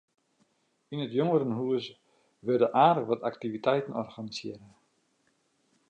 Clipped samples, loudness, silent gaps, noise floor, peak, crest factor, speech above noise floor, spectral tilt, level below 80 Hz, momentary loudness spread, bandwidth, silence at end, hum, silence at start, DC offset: under 0.1%; -29 LUFS; none; -72 dBFS; -10 dBFS; 22 dB; 44 dB; -7 dB/octave; -78 dBFS; 16 LU; 8.8 kHz; 1.25 s; none; 0.9 s; under 0.1%